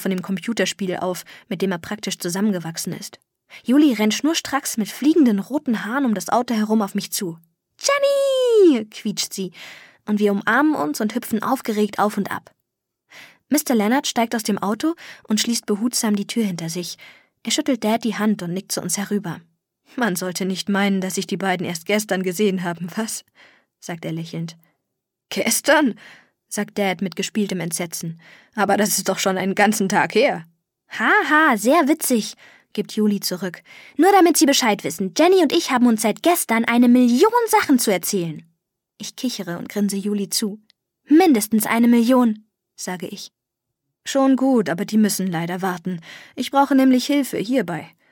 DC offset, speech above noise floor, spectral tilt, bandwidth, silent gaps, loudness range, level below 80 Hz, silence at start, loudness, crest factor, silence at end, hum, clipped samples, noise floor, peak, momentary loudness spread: under 0.1%; 61 dB; -4 dB/octave; 17.5 kHz; none; 6 LU; -72 dBFS; 0 s; -20 LUFS; 18 dB; 0.25 s; none; under 0.1%; -80 dBFS; -2 dBFS; 16 LU